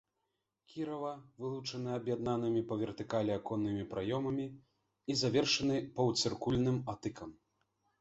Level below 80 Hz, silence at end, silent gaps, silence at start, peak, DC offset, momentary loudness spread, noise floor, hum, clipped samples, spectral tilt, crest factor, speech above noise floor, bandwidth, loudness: -64 dBFS; 0.7 s; none; 0.7 s; -18 dBFS; under 0.1%; 12 LU; -85 dBFS; none; under 0.1%; -5 dB/octave; 18 dB; 50 dB; 8 kHz; -36 LUFS